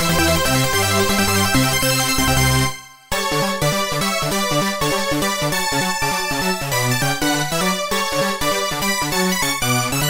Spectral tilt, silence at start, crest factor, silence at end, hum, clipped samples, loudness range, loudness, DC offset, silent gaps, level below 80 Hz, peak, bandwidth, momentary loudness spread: -3 dB/octave; 0 s; 16 dB; 0 s; none; under 0.1%; 2 LU; -18 LUFS; under 0.1%; none; -36 dBFS; -4 dBFS; 16.5 kHz; 4 LU